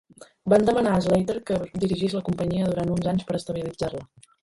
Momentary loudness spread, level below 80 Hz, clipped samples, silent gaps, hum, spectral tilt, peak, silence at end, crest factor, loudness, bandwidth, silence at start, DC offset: 11 LU; -50 dBFS; under 0.1%; none; none; -7 dB/octave; -6 dBFS; 0.35 s; 18 dB; -24 LUFS; 11.5 kHz; 0.2 s; under 0.1%